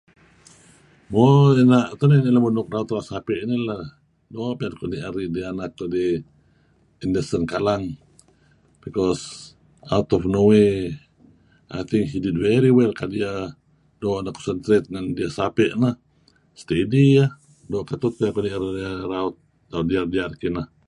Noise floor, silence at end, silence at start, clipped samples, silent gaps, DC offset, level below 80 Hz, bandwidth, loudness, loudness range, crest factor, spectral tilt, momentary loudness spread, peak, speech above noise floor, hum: -59 dBFS; 0.25 s; 1.1 s; under 0.1%; none; under 0.1%; -48 dBFS; 11 kHz; -21 LUFS; 8 LU; 20 dB; -7.5 dB/octave; 15 LU; -2 dBFS; 39 dB; none